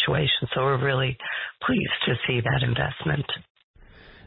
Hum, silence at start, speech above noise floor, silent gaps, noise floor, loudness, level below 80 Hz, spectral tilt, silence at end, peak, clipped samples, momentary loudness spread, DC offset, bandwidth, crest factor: none; 0 s; 25 dB; 3.50-3.55 s, 3.64-3.74 s; -49 dBFS; -25 LUFS; -48 dBFS; -10.5 dB/octave; 0.15 s; -10 dBFS; under 0.1%; 7 LU; under 0.1%; 4.1 kHz; 14 dB